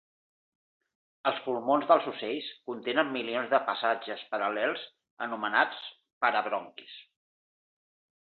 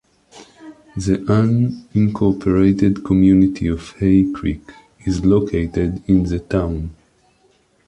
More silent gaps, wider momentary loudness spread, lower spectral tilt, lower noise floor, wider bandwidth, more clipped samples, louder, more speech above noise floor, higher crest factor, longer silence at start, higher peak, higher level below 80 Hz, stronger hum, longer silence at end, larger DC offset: first, 5.11-5.17 s, 6.13-6.21 s vs none; first, 17 LU vs 11 LU; second, -7 dB/octave vs -8.5 dB/octave; first, under -90 dBFS vs -58 dBFS; second, 4.6 kHz vs 9.6 kHz; neither; second, -30 LUFS vs -17 LUFS; first, over 60 dB vs 41 dB; first, 24 dB vs 14 dB; first, 1.25 s vs 0.35 s; second, -8 dBFS vs -2 dBFS; second, -84 dBFS vs -34 dBFS; neither; first, 1.25 s vs 0.95 s; neither